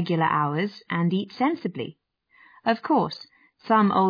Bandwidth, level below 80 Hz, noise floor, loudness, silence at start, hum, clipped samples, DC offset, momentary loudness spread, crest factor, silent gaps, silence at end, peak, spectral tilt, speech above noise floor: 5.2 kHz; -72 dBFS; -58 dBFS; -24 LUFS; 0 s; none; under 0.1%; under 0.1%; 11 LU; 16 dB; none; 0 s; -8 dBFS; -8.5 dB/octave; 35 dB